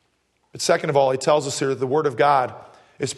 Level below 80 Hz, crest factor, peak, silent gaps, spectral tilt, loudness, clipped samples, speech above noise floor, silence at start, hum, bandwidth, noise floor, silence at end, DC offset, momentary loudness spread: -68 dBFS; 18 dB; -4 dBFS; none; -4 dB/octave; -21 LUFS; under 0.1%; 47 dB; 0.55 s; none; 12.5 kHz; -67 dBFS; 0 s; under 0.1%; 7 LU